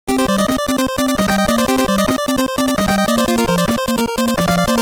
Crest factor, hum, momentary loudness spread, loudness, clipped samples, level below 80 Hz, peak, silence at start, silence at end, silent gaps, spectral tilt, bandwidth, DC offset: 14 dB; none; 2 LU; -16 LUFS; under 0.1%; -36 dBFS; -2 dBFS; 0.05 s; 0 s; none; -4.5 dB/octave; over 20 kHz; under 0.1%